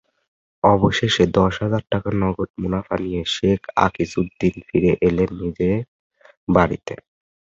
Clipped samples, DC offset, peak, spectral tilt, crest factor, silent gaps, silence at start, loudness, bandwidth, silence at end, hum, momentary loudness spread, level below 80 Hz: under 0.1%; under 0.1%; -2 dBFS; -6.5 dB/octave; 18 dB; 2.50-2.54 s, 5.88-6.10 s, 6.37-6.47 s; 0.65 s; -20 LUFS; 7.8 kHz; 0.55 s; none; 8 LU; -40 dBFS